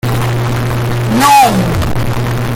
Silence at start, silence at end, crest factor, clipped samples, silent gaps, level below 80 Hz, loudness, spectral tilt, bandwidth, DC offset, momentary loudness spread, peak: 0.05 s; 0 s; 12 dB; under 0.1%; none; -26 dBFS; -12 LUFS; -5.5 dB/octave; 17 kHz; under 0.1%; 9 LU; 0 dBFS